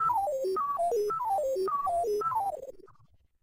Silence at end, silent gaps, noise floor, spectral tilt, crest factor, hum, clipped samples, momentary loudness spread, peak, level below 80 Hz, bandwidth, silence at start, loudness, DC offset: 0.5 s; none; -63 dBFS; -5 dB/octave; 10 dB; none; under 0.1%; 5 LU; -20 dBFS; -64 dBFS; 16 kHz; 0 s; -30 LUFS; under 0.1%